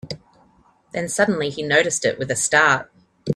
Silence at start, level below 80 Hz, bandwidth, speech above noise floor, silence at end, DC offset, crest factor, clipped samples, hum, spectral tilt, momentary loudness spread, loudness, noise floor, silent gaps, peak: 0.05 s; -60 dBFS; 14.5 kHz; 37 dB; 0 s; under 0.1%; 20 dB; under 0.1%; none; -3 dB/octave; 18 LU; -19 LUFS; -57 dBFS; none; -2 dBFS